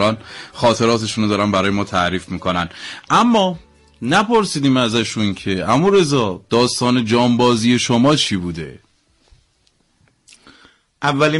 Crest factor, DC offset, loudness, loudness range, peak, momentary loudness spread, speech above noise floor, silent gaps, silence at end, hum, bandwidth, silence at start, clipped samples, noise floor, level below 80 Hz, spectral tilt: 12 dB; under 0.1%; -16 LUFS; 4 LU; -4 dBFS; 10 LU; 44 dB; none; 0 s; none; 11.5 kHz; 0 s; under 0.1%; -61 dBFS; -48 dBFS; -5 dB/octave